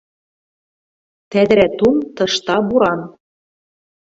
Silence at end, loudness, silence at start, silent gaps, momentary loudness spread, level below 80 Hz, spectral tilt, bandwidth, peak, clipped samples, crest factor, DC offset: 1.05 s; -15 LUFS; 1.3 s; none; 9 LU; -50 dBFS; -5 dB/octave; 8 kHz; -2 dBFS; under 0.1%; 18 dB; under 0.1%